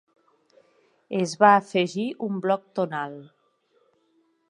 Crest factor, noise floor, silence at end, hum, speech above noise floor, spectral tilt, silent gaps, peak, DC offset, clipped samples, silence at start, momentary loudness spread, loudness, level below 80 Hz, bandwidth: 24 dB; -67 dBFS; 1.25 s; none; 44 dB; -5.5 dB/octave; none; -2 dBFS; under 0.1%; under 0.1%; 1.1 s; 15 LU; -24 LUFS; -78 dBFS; 11 kHz